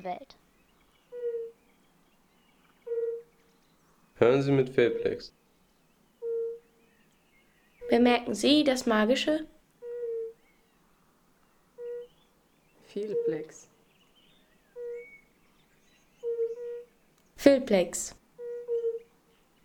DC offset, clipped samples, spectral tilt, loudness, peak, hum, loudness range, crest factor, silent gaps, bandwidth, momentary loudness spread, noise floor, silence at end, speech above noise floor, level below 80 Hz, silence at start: under 0.1%; under 0.1%; -5 dB/octave; -29 LUFS; -6 dBFS; none; 13 LU; 26 dB; none; 19.5 kHz; 21 LU; -66 dBFS; 0.65 s; 40 dB; -64 dBFS; 0 s